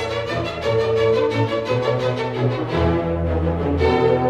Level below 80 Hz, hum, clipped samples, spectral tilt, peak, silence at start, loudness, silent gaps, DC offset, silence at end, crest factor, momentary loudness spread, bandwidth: -34 dBFS; none; under 0.1%; -7.5 dB/octave; -6 dBFS; 0 s; -20 LUFS; none; under 0.1%; 0 s; 14 dB; 5 LU; 9.8 kHz